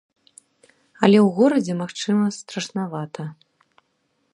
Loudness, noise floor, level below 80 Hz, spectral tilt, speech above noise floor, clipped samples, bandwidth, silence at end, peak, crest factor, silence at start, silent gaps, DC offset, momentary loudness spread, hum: -21 LUFS; -70 dBFS; -70 dBFS; -6 dB/octave; 50 dB; under 0.1%; 11 kHz; 1 s; 0 dBFS; 22 dB; 1 s; none; under 0.1%; 16 LU; none